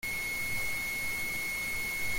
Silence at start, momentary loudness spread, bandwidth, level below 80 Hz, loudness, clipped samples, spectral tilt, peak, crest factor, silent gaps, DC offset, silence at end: 0 s; 0 LU; 17 kHz; -50 dBFS; -32 LUFS; under 0.1%; -1.5 dB/octave; -22 dBFS; 12 dB; none; under 0.1%; 0 s